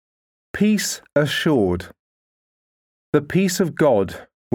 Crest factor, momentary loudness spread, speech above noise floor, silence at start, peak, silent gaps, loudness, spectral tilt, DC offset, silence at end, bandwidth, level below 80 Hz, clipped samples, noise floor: 18 dB; 10 LU; over 71 dB; 0.55 s; -4 dBFS; 1.99-3.13 s; -20 LUFS; -5 dB/octave; under 0.1%; 0.3 s; 19.5 kHz; -52 dBFS; under 0.1%; under -90 dBFS